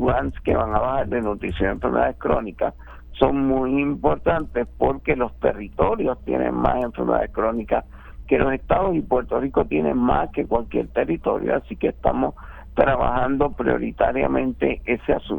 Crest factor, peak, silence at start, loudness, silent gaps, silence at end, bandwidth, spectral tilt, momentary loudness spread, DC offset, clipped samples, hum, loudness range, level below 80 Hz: 18 dB; -2 dBFS; 0 s; -22 LUFS; none; 0 s; 19 kHz; -9.5 dB/octave; 4 LU; under 0.1%; under 0.1%; none; 1 LU; -36 dBFS